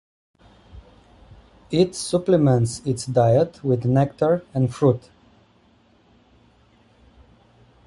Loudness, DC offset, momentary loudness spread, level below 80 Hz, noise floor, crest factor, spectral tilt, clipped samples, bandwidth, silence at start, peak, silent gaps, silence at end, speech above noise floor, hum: -21 LUFS; under 0.1%; 7 LU; -52 dBFS; -57 dBFS; 18 dB; -7 dB/octave; under 0.1%; 11.5 kHz; 0.75 s; -4 dBFS; none; 2.9 s; 38 dB; none